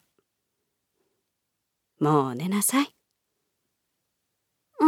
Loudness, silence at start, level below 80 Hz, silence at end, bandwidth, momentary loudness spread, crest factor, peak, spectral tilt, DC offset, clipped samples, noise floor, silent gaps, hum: -25 LUFS; 2 s; -80 dBFS; 0 s; 18 kHz; 5 LU; 22 dB; -8 dBFS; -4.5 dB/octave; under 0.1%; under 0.1%; -81 dBFS; none; none